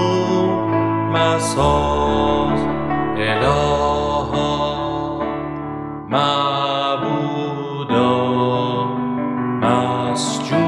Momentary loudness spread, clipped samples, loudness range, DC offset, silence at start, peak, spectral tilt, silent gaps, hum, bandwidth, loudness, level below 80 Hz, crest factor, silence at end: 7 LU; under 0.1%; 3 LU; under 0.1%; 0 s; -2 dBFS; -5.5 dB/octave; none; none; 12.5 kHz; -19 LUFS; -36 dBFS; 18 dB; 0 s